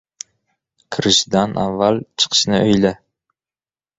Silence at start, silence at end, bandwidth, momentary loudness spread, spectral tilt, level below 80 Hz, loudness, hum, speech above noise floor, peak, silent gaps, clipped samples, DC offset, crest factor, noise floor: 0.9 s; 1.05 s; 8 kHz; 21 LU; -4 dB/octave; -50 dBFS; -16 LUFS; none; over 74 dB; 0 dBFS; none; under 0.1%; under 0.1%; 18 dB; under -90 dBFS